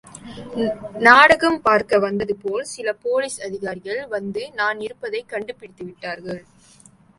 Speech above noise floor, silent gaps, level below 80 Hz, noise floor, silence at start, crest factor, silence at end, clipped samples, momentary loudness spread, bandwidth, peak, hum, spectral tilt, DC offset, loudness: 31 dB; none; -56 dBFS; -51 dBFS; 0.15 s; 20 dB; 0.8 s; under 0.1%; 21 LU; 11.5 kHz; 0 dBFS; none; -4 dB/octave; under 0.1%; -19 LUFS